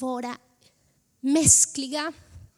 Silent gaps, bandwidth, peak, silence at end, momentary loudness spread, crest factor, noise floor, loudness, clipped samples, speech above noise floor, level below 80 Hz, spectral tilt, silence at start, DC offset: none; 16.5 kHz; -4 dBFS; 0.2 s; 19 LU; 22 dB; -67 dBFS; -20 LUFS; under 0.1%; 44 dB; -50 dBFS; -2.5 dB/octave; 0 s; under 0.1%